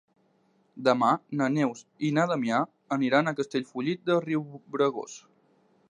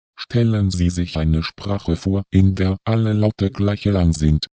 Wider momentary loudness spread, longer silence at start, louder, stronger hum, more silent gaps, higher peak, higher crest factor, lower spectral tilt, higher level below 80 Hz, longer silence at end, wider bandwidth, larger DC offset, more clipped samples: first, 8 LU vs 5 LU; first, 0.75 s vs 0.2 s; second, -27 LUFS vs -19 LUFS; neither; neither; second, -8 dBFS vs -2 dBFS; about the same, 20 dB vs 16 dB; about the same, -6 dB/octave vs -7 dB/octave; second, -80 dBFS vs -28 dBFS; first, 0.7 s vs 0.05 s; first, 10 kHz vs 8 kHz; neither; neither